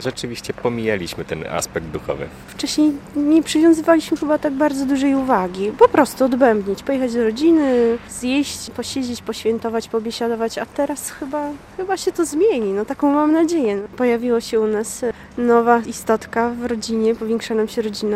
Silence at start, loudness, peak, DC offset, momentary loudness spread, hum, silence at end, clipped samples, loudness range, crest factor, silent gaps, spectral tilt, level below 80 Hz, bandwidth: 0 s; -19 LUFS; 0 dBFS; under 0.1%; 11 LU; none; 0 s; under 0.1%; 6 LU; 18 dB; none; -4.5 dB/octave; -50 dBFS; 15.5 kHz